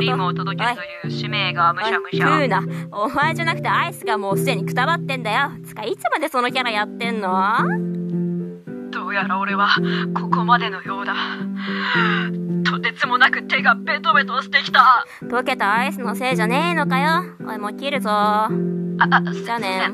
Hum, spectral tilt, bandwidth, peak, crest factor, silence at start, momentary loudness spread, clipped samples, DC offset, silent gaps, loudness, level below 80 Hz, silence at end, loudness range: none; -5.5 dB/octave; 14.5 kHz; 0 dBFS; 20 dB; 0 s; 9 LU; under 0.1%; under 0.1%; none; -19 LUFS; -66 dBFS; 0 s; 4 LU